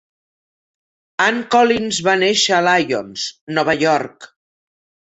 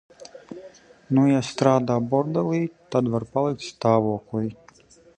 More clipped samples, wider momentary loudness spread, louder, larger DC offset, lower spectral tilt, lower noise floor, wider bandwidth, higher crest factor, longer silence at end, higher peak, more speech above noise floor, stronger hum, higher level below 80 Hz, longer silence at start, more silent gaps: neither; about the same, 11 LU vs 13 LU; first, -16 LUFS vs -23 LUFS; neither; second, -3 dB/octave vs -7 dB/octave; first, under -90 dBFS vs -53 dBFS; second, 8.2 kHz vs 9.4 kHz; about the same, 18 dB vs 22 dB; first, 0.9 s vs 0.65 s; about the same, -2 dBFS vs -2 dBFS; first, over 73 dB vs 31 dB; neither; about the same, -58 dBFS vs -60 dBFS; first, 1.2 s vs 0.2 s; first, 3.41-3.47 s vs none